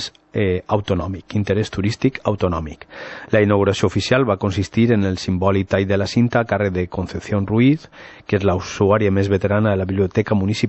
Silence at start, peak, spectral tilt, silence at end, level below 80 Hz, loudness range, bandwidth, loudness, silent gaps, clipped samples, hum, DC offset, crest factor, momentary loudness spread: 0 s; -2 dBFS; -7 dB/octave; 0 s; -44 dBFS; 2 LU; 8.4 kHz; -19 LUFS; none; under 0.1%; none; under 0.1%; 16 dB; 8 LU